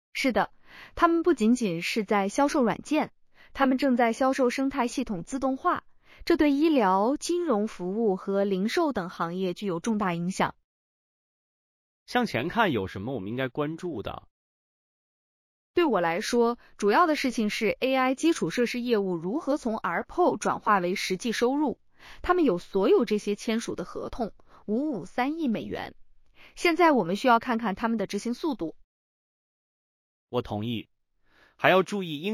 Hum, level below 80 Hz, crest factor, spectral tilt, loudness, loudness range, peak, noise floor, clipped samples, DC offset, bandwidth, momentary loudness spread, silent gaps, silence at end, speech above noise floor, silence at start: none; -56 dBFS; 22 dB; -5 dB/octave; -26 LUFS; 6 LU; -4 dBFS; -64 dBFS; under 0.1%; under 0.1%; 15.5 kHz; 11 LU; 10.64-12.06 s, 14.31-15.74 s, 28.84-30.27 s; 0 s; 38 dB; 0.15 s